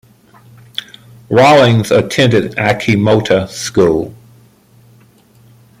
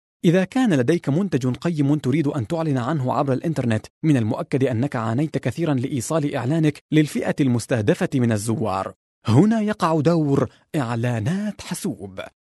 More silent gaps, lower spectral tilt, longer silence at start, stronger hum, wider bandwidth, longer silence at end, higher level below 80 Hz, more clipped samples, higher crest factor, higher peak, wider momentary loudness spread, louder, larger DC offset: second, none vs 3.90-4.01 s, 6.81-6.89 s, 8.96-9.22 s; second, -5.5 dB/octave vs -7 dB/octave; first, 1.3 s vs 0.25 s; neither; first, 16 kHz vs 12.5 kHz; first, 1.65 s vs 0.3 s; first, -46 dBFS vs -58 dBFS; neither; about the same, 14 dB vs 18 dB; about the same, 0 dBFS vs -2 dBFS; first, 18 LU vs 8 LU; first, -11 LUFS vs -21 LUFS; neither